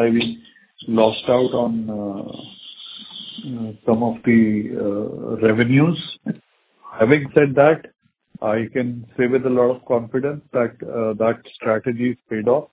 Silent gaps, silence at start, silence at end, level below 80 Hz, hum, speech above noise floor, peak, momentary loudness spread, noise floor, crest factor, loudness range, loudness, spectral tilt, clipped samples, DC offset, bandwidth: none; 0 s; 0.05 s; -56 dBFS; none; 26 dB; 0 dBFS; 17 LU; -45 dBFS; 20 dB; 4 LU; -20 LUFS; -11 dB/octave; under 0.1%; under 0.1%; 4 kHz